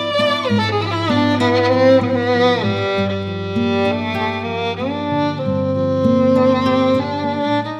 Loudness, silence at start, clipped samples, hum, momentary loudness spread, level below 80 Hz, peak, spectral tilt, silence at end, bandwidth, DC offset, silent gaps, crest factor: -17 LUFS; 0 s; under 0.1%; none; 7 LU; -56 dBFS; -2 dBFS; -6.5 dB/octave; 0 s; 10 kHz; under 0.1%; none; 14 dB